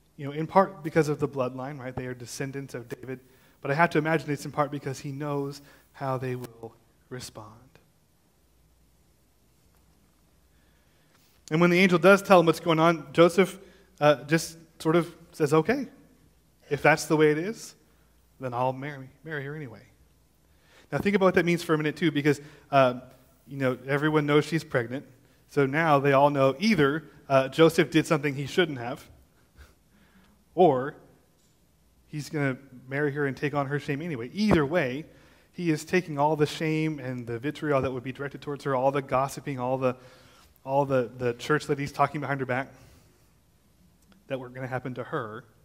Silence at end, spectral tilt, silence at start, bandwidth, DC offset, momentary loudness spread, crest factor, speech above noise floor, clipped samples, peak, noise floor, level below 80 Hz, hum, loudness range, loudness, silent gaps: 0.25 s; -6 dB/octave; 0.2 s; 16 kHz; under 0.1%; 17 LU; 24 dB; 40 dB; under 0.1%; -4 dBFS; -66 dBFS; -60 dBFS; none; 10 LU; -26 LUFS; none